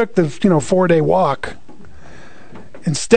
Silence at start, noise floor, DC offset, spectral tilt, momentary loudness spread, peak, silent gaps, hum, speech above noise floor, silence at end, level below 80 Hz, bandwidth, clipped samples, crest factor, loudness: 0 s; -41 dBFS; 3%; -6 dB/octave; 12 LU; 0 dBFS; none; none; 27 dB; 0 s; -46 dBFS; 9.4 kHz; under 0.1%; 18 dB; -16 LUFS